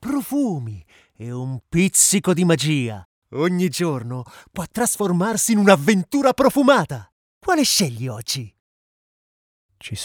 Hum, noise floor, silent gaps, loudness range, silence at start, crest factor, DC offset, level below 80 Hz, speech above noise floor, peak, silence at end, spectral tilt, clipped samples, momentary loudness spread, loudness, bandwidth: none; under -90 dBFS; 3.05-3.22 s, 7.12-7.41 s, 8.60-9.69 s; 4 LU; 0 s; 20 dB; under 0.1%; -54 dBFS; over 71 dB; 0 dBFS; 0 s; -4 dB/octave; under 0.1%; 19 LU; -19 LUFS; over 20 kHz